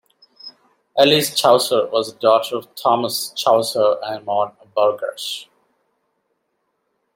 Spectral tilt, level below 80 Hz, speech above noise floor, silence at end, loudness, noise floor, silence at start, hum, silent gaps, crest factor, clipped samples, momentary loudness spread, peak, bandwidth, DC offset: -3 dB/octave; -70 dBFS; 54 dB; 1.7 s; -18 LUFS; -71 dBFS; 0.45 s; none; none; 18 dB; under 0.1%; 13 LU; -2 dBFS; 16.5 kHz; under 0.1%